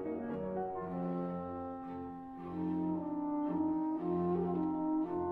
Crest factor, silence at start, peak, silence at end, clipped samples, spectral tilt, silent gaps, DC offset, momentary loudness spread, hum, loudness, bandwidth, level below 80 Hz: 12 dB; 0 s; -24 dBFS; 0 s; under 0.1%; -11.5 dB/octave; none; under 0.1%; 9 LU; none; -37 LUFS; 4 kHz; -66 dBFS